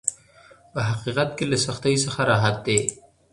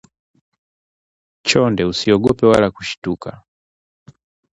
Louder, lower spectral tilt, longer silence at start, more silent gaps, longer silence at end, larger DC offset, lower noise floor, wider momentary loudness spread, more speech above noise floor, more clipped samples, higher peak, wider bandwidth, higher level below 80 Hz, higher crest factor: second, -23 LUFS vs -16 LUFS; about the same, -4 dB/octave vs -5 dB/octave; second, 0.05 s vs 1.45 s; second, none vs 2.98-3.02 s; second, 0.4 s vs 1.2 s; neither; second, -52 dBFS vs under -90 dBFS; second, 8 LU vs 12 LU; second, 29 dB vs over 74 dB; neither; about the same, 0 dBFS vs 0 dBFS; about the same, 11.5 kHz vs 11.5 kHz; second, -54 dBFS vs -46 dBFS; about the same, 24 dB vs 20 dB